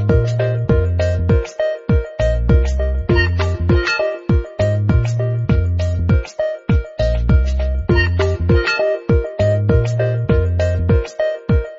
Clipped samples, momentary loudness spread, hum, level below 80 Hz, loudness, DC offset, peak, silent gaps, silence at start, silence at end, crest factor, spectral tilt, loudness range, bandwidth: under 0.1%; 4 LU; none; -22 dBFS; -17 LUFS; under 0.1%; -2 dBFS; none; 0 s; 0 s; 14 dB; -7.5 dB/octave; 1 LU; 7.8 kHz